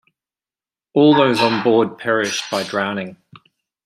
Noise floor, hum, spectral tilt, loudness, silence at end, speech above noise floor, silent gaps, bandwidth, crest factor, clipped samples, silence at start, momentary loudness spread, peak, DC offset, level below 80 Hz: under -90 dBFS; none; -4.5 dB/octave; -17 LUFS; 0.7 s; over 74 dB; none; 15 kHz; 18 dB; under 0.1%; 0.95 s; 10 LU; -2 dBFS; under 0.1%; -64 dBFS